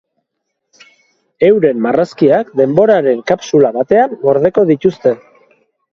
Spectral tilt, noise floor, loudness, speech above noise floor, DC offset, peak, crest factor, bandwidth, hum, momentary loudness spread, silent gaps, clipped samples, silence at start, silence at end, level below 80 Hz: -7 dB/octave; -73 dBFS; -12 LUFS; 62 dB; under 0.1%; 0 dBFS; 12 dB; 7.2 kHz; none; 4 LU; none; under 0.1%; 1.4 s; 0.75 s; -54 dBFS